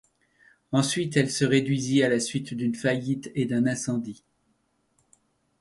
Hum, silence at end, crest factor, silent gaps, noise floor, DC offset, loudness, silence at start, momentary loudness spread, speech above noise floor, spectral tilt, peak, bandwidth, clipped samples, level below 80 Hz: none; 1.45 s; 20 dB; none; -71 dBFS; under 0.1%; -25 LUFS; 0.7 s; 7 LU; 46 dB; -5 dB/octave; -8 dBFS; 11.5 kHz; under 0.1%; -64 dBFS